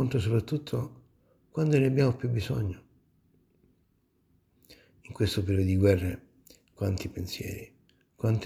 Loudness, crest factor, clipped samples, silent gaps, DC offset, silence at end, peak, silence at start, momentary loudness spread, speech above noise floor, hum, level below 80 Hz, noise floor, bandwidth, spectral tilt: -29 LUFS; 20 dB; under 0.1%; none; under 0.1%; 0 s; -10 dBFS; 0 s; 15 LU; 43 dB; none; -54 dBFS; -70 dBFS; 15.5 kHz; -7 dB/octave